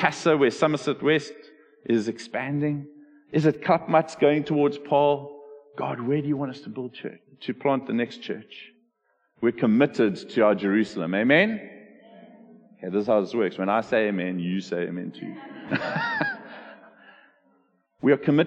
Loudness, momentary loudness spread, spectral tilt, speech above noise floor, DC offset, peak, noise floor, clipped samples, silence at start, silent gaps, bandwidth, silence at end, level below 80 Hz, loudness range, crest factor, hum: -24 LUFS; 17 LU; -6.5 dB/octave; 47 dB; under 0.1%; -4 dBFS; -71 dBFS; under 0.1%; 0 s; none; 9.4 kHz; 0 s; -70 dBFS; 7 LU; 22 dB; none